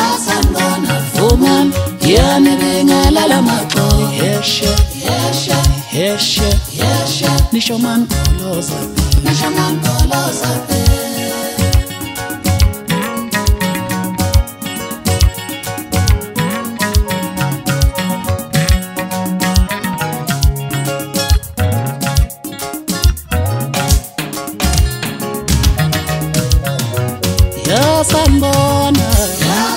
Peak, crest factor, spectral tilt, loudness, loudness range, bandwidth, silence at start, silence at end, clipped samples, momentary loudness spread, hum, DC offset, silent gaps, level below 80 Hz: 0 dBFS; 14 dB; -4.5 dB/octave; -14 LUFS; 5 LU; 16.5 kHz; 0 s; 0 s; under 0.1%; 8 LU; none; under 0.1%; none; -20 dBFS